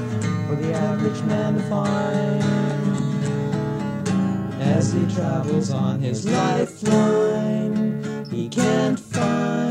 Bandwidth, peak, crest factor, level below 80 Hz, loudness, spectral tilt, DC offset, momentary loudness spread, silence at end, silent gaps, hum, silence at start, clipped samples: 11.5 kHz; -6 dBFS; 16 dB; -56 dBFS; -22 LUFS; -6.5 dB/octave; under 0.1%; 5 LU; 0 s; none; none; 0 s; under 0.1%